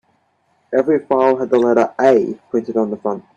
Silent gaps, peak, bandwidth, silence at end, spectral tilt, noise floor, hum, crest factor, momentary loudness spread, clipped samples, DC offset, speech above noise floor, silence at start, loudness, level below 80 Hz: none; 0 dBFS; 8 kHz; 0.15 s; -7 dB/octave; -62 dBFS; none; 16 dB; 7 LU; under 0.1%; under 0.1%; 46 dB; 0.7 s; -16 LUFS; -62 dBFS